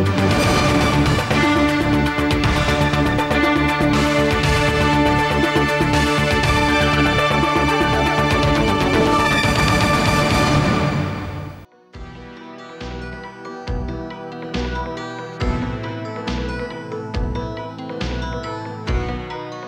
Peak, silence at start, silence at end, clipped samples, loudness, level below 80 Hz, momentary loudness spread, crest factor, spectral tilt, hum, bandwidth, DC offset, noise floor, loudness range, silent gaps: -6 dBFS; 0 s; 0 s; under 0.1%; -18 LUFS; -30 dBFS; 15 LU; 12 dB; -5.5 dB/octave; none; 16 kHz; under 0.1%; -39 dBFS; 12 LU; none